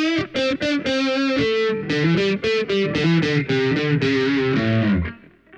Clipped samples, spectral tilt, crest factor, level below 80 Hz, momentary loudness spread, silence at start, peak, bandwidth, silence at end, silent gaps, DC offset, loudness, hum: under 0.1%; -6.5 dB/octave; 12 dB; -46 dBFS; 3 LU; 0 s; -8 dBFS; 8.8 kHz; 0 s; none; under 0.1%; -20 LUFS; none